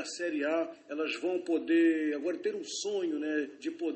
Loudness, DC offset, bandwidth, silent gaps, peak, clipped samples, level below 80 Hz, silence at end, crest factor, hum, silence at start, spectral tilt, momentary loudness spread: -32 LUFS; under 0.1%; 8.4 kHz; none; -18 dBFS; under 0.1%; -82 dBFS; 0 s; 14 dB; none; 0 s; -3 dB/octave; 10 LU